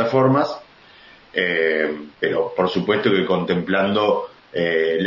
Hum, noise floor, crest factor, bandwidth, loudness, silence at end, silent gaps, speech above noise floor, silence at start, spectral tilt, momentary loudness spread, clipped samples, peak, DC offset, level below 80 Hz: none; -47 dBFS; 16 dB; 7.2 kHz; -20 LUFS; 0 s; none; 28 dB; 0 s; -7.5 dB/octave; 7 LU; under 0.1%; -4 dBFS; under 0.1%; -60 dBFS